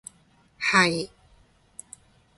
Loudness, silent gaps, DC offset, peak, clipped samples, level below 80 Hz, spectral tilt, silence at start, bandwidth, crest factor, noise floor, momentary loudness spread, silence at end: -22 LUFS; none; under 0.1%; -6 dBFS; under 0.1%; -62 dBFS; -3.5 dB/octave; 0.6 s; 11.5 kHz; 24 dB; -60 dBFS; 26 LU; 1.3 s